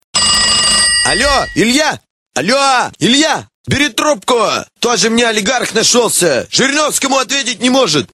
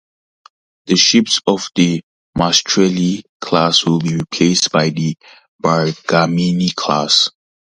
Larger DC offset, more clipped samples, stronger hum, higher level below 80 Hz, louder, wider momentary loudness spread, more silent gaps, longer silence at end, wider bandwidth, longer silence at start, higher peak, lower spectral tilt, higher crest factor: neither; neither; neither; first, -38 dBFS vs -50 dBFS; first, -11 LUFS vs -14 LUFS; about the same, 7 LU vs 9 LU; second, 2.10-2.30 s, 3.54-3.64 s vs 2.03-2.33 s, 3.29-3.40 s, 5.48-5.59 s; second, 0.1 s vs 0.45 s; first, 16 kHz vs 10 kHz; second, 0.15 s vs 0.85 s; about the same, 0 dBFS vs 0 dBFS; second, -2 dB/octave vs -4 dB/octave; about the same, 12 dB vs 16 dB